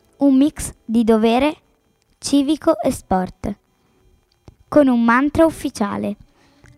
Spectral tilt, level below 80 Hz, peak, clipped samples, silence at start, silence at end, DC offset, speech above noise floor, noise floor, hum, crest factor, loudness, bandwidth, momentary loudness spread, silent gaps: -5.5 dB/octave; -44 dBFS; -2 dBFS; under 0.1%; 0.2 s; 0.65 s; under 0.1%; 45 dB; -61 dBFS; none; 16 dB; -18 LUFS; 14.5 kHz; 15 LU; none